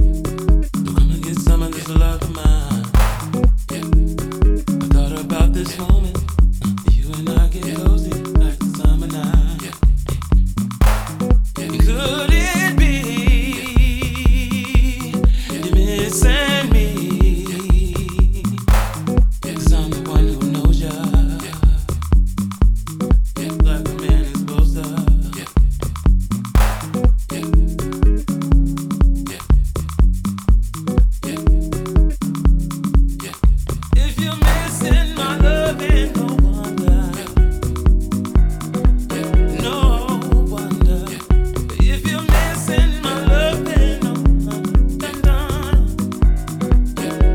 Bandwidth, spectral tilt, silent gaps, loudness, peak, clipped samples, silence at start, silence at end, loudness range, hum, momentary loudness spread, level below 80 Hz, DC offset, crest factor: 15.5 kHz; -6 dB/octave; none; -18 LUFS; 0 dBFS; under 0.1%; 0 s; 0 s; 2 LU; none; 4 LU; -16 dBFS; under 0.1%; 14 dB